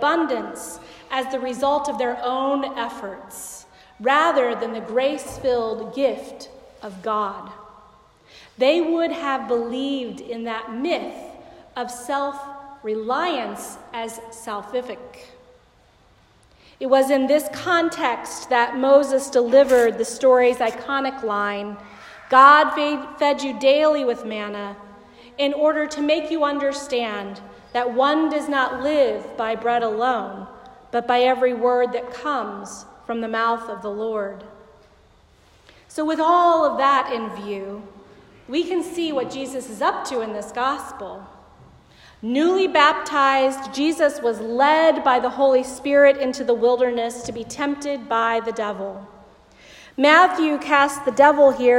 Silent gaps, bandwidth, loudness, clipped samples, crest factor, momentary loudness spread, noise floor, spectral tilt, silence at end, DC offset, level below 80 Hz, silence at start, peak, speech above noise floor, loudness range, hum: none; 16 kHz; -20 LUFS; under 0.1%; 20 dB; 18 LU; -55 dBFS; -3.5 dB/octave; 0 s; under 0.1%; -58 dBFS; 0 s; 0 dBFS; 35 dB; 10 LU; none